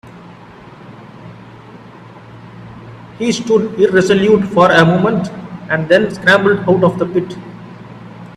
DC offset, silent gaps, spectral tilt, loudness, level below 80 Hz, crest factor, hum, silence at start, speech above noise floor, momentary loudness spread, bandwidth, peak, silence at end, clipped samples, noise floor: under 0.1%; none; -6 dB/octave; -13 LUFS; -50 dBFS; 16 dB; none; 0.05 s; 25 dB; 25 LU; 12 kHz; 0 dBFS; 0.05 s; under 0.1%; -37 dBFS